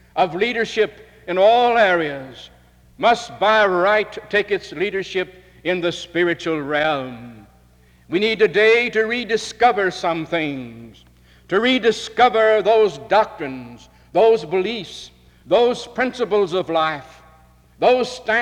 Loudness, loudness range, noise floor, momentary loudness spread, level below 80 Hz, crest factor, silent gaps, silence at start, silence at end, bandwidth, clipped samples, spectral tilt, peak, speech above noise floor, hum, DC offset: -18 LUFS; 4 LU; -52 dBFS; 13 LU; -54 dBFS; 16 dB; none; 0.15 s; 0 s; 11 kHz; under 0.1%; -4.5 dB/octave; -4 dBFS; 34 dB; none; under 0.1%